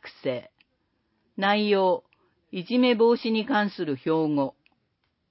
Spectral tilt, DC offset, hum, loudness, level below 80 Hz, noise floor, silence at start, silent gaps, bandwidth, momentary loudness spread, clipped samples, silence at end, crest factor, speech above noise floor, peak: -10 dB/octave; under 0.1%; none; -24 LUFS; -76 dBFS; -74 dBFS; 0.05 s; none; 5.8 kHz; 13 LU; under 0.1%; 0.8 s; 18 dB; 50 dB; -8 dBFS